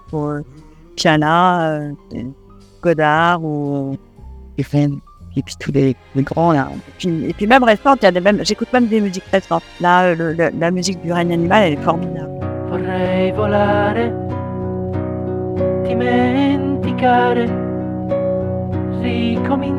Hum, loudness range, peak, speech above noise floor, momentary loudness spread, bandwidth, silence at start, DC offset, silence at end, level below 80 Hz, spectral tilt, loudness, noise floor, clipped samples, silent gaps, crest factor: none; 4 LU; 0 dBFS; 21 dB; 12 LU; 13 kHz; 0.05 s; under 0.1%; 0 s; -44 dBFS; -6 dB/octave; -17 LUFS; -36 dBFS; under 0.1%; none; 16 dB